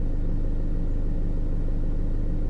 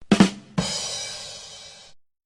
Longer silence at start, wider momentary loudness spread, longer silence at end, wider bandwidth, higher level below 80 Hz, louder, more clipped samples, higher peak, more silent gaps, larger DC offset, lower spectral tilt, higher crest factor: about the same, 0 s vs 0 s; second, 0 LU vs 21 LU; second, 0 s vs 0.3 s; second, 2.1 kHz vs 11 kHz; first, -24 dBFS vs -52 dBFS; second, -31 LUFS vs -24 LUFS; neither; second, -16 dBFS vs -2 dBFS; neither; neither; first, -10 dB/octave vs -4.5 dB/octave; second, 6 dB vs 24 dB